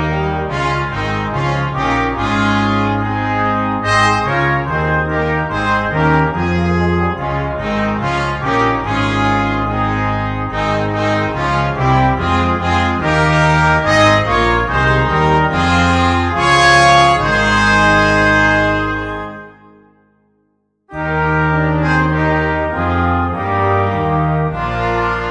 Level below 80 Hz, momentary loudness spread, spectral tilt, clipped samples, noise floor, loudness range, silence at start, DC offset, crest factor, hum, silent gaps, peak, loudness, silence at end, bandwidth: -30 dBFS; 7 LU; -5.5 dB/octave; under 0.1%; -63 dBFS; 5 LU; 0 s; under 0.1%; 14 dB; none; none; 0 dBFS; -14 LUFS; 0 s; 10 kHz